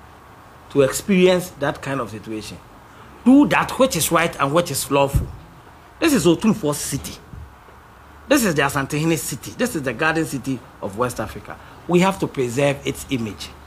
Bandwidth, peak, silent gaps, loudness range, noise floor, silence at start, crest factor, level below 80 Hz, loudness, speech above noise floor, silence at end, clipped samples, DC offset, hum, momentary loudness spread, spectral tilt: 16 kHz; -2 dBFS; none; 4 LU; -45 dBFS; 0.3 s; 18 dB; -40 dBFS; -20 LUFS; 25 dB; 0 s; under 0.1%; under 0.1%; none; 15 LU; -5 dB/octave